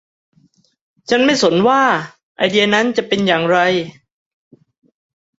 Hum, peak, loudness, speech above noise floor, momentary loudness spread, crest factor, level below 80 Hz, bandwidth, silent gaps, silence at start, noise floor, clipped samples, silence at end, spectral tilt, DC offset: none; 0 dBFS; -15 LUFS; 42 dB; 9 LU; 16 dB; -60 dBFS; 8 kHz; 2.23-2.35 s; 1.1 s; -56 dBFS; under 0.1%; 1.5 s; -4.5 dB/octave; under 0.1%